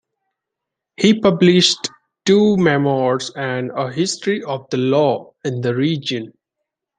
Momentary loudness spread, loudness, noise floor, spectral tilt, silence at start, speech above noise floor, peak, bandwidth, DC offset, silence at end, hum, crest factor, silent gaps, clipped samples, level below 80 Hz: 11 LU; -17 LUFS; -82 dBFS; -5 dB/octave; 1 s; 66 dB; -2 dBFS; 9.8 kHz; under 0.1%; 0.7 s; none; 16 dB; none; under 0.1%; -58 dBFS